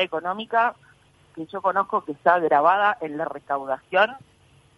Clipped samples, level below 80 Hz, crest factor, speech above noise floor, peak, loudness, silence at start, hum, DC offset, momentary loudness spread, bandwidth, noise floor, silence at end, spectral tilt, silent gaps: under 0.1%; -68 dBFS; 20 dB; 34 dB; -4 dBFS; -23 LUFS; 0 s; none; under 0.1%; 11 LU; 11.5 kHz; -56 dBFS; 0.6 s; -5.5 dB/octave; none